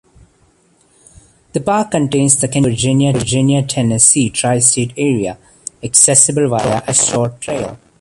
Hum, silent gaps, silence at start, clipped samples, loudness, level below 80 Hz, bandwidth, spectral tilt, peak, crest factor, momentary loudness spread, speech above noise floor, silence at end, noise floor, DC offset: none; none; 1.55 s; under 0.1%; -12 LUFS; -44 dBFS; 13.5 kHz; -4 dB/octave; 0 dBFS; 14 dB; 13 LU; 40 dB; 0.25 s; -54 dBFS; under 0.1%